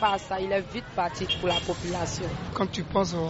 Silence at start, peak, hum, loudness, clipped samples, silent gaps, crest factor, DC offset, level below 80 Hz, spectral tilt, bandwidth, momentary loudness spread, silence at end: 0 s; -10 dBFS; none; -29 LUFS; under 0.1%; none; 18 dB; under 0.1%; -46 dBFS; -3.5 dB/octave; 8 kHz; 5 LU; 0 s